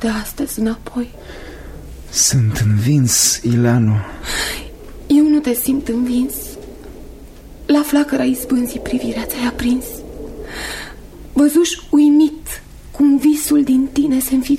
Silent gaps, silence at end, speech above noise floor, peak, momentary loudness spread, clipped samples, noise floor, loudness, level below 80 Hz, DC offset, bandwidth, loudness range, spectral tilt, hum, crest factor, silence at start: none; 0 s; 21 dB; -2 dBFS; 20 LU; under 0.1%; -36 dBFS; -16 LUFS; -36 dBFS; under 0.1%; 16.5 kHz; 5 LU; -4.5 dB/octave; none; 14 dB; 0 s